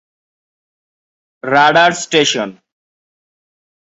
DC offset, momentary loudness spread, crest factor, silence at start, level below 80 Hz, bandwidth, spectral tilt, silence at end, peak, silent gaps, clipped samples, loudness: under 0.1%; 15 LU; 16 dB; 1.45 s; -62 dBFS; 8.2 kHz; -2.5 dB/octave; 1.35 s; 0 dBFS; none; under 0.1%; -12 LUFS